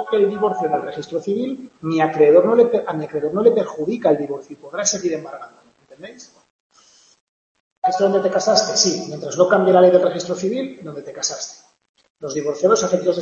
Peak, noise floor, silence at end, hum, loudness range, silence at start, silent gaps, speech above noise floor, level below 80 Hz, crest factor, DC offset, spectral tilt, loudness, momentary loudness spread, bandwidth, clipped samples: 0 dBFS; -53 dBFS; 0 s; none; 9 LU; 0 s; 6.50-6.70 s, 7.21-7.82 s, 11.89-11.94 s, 12.10-12.15 s; 35 dB; -66 dBFS; 18 dB; under 0.1%; -4 dB/octave; -18 LUFS; 17 LU; 8.2 kHz; under 0.1%